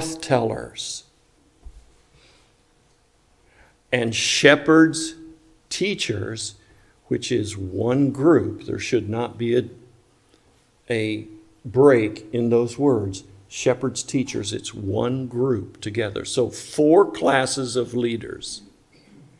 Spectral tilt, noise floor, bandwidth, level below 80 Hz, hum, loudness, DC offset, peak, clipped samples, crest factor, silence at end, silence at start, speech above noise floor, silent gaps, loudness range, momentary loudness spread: -4.5 dB/octave; -60 dBFS; 12 kHz; -56 dBFS; none; -22 LUFS; under 0.1%; 0 dBFS; under 0.1%; 22 dB; 0.8 s; 0 s; 39 dB; none; 7 LU; 15 LU